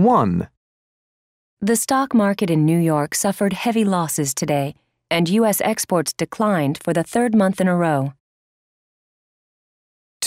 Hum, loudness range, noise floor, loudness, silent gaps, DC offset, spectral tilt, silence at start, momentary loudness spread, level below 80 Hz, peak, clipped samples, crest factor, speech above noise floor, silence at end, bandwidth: none; 3 LU; under -90 dBFS; -19 LUFS; 0.57-1.57 s, 8.20-10.20 s; under 0.1%; -5 dB/octave; 0 s; 6 LU; -58 dBFS; -4 dBFS; under 0.1%; 16 dB; over 72 dB; 0 s; 16 kHz